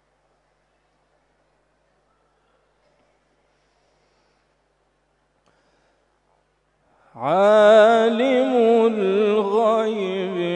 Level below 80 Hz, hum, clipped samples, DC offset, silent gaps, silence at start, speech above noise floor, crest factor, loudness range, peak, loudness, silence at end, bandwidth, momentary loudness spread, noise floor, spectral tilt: -72 dBFS; 50 Hz at -70 dBFS; under 0.1%; under 0.1%; none; 7.15 s; 52 dB; 18 dB; 7 LU; -4 dBFS; -17 LUFS; 0 s; 9.2 kHz; 12 LU; -66 dBFS; -6 dB/octave